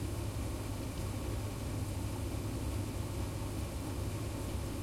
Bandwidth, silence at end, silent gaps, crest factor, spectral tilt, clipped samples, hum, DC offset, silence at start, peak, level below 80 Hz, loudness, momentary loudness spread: 16.5 kHz; 0 s; none; 12 dB; -5.5 dB/octave; under 0.1%; none; under 0.1%; 0 s; -26 dBFS; -44 dBFS; -39 LUFS; 1 LU